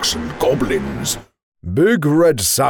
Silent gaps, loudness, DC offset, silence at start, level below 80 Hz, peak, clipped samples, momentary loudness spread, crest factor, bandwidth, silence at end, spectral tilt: 1.43-1.52 s; -17 LUFS; under 0.1%; 0 s; -40 dBFS; -6 dBFS; under 0.1%; 10 LU; 12 dB; over 20 kHz; 0 s; -4 dB/octave